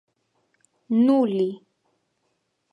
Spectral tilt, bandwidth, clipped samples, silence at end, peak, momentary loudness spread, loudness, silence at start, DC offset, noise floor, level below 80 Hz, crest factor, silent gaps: -8.5 dB/octave; 5.4 kHz; under 0.1%; 1.15 s; -10 dBFS; 11 LU; -22 LUFS; 0.9 s; under 0.1%; -73 dBFS; -78 dBFS; 16 dB; none